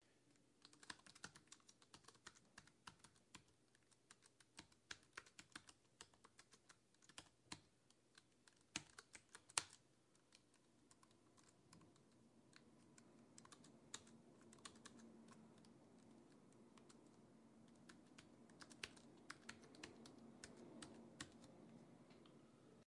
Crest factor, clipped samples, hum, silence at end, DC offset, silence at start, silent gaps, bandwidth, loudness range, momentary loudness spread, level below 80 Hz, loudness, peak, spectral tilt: 44 dB; under 0.1%; none; 0 s; under 0.1%; 0 s; none; 12 kHz; 12 LU; 13 LU; -90 dBFS; -60 LUFS; -18 dBFS; -1.5 dB/octave